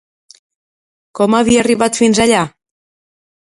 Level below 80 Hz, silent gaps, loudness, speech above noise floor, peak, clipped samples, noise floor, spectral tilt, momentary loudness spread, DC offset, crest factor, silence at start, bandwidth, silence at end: -46 dBFS; none; -13 LUFS; over 78 dB; 0 dBFS; under 0.1%; under -90 dBFS; -4 dB/octave; 9 LU; under 0.1%; 16 dB; 1.15 s; 11.5 kHz; 0.95 s